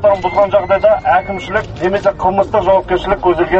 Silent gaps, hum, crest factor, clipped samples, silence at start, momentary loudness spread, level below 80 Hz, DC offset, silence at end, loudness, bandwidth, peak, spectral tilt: none; none; 12 dB; under 0.1%; 0 s; 6 LU; -34 dBFS; under 0.1%; 0 s; -14 LUFS; 7.8 kHz; 0 dBFS; -7 dB/octave